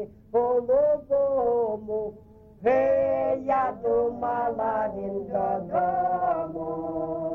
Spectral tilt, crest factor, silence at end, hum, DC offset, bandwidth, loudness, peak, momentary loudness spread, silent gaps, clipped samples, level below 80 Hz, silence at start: -9 dB/octave; 14 dB; 0 s; none; under 0.1%; 3.7 kHz; -26 LUFS; -12 dBFS; 8 LU; none; under 0.1%; -56 dBFS; 0 s